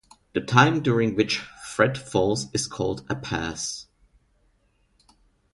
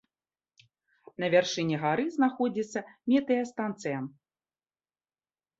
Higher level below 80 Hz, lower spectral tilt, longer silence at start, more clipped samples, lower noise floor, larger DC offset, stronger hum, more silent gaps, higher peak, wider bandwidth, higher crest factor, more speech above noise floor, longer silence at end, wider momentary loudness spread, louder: first, -52 dBFS vs -76 dBFS; about the same, -4.5 dB/octave vs -5.5 dB/octave; second, 0.35 s vs 1.2 s; neither; second, -66 dBFS vs under -90 dBFS; neither; neither; neither; first, -4 dBFS vs -10 dBFS; first, 11.5 kHz vs 8 kHz; about the same, 22 dB vs 20 dB; second, 42 dB vs over 62 dB; first, 1.7 s vs 1.5 s; first, 13 LU vs 10 LU; first, -24 LUFS vs -29 LUFS